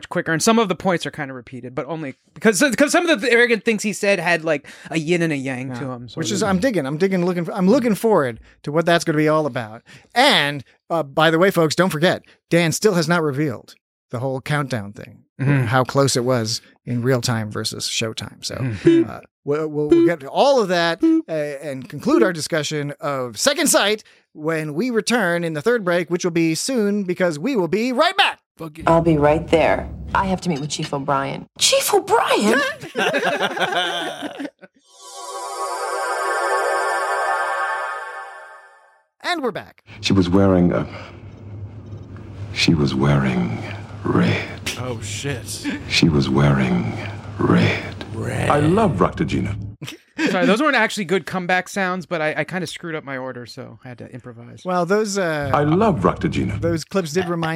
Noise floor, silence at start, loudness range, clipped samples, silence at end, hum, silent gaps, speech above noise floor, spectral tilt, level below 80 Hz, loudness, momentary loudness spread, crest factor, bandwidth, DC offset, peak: -54 dBFS; 0 s; 4 LU; under 0.1%; 0 s; none; 13.81-14.09 s, 15.29-15.36 s, 19.31-19.43 s, 28.46-28.55 s; 34 dB; -4.5 dB/octave; -46 dBFS; -19 LUFS; 15 LU; 18 dB; 16.5 kHz; under 0.1%; -2 dBFS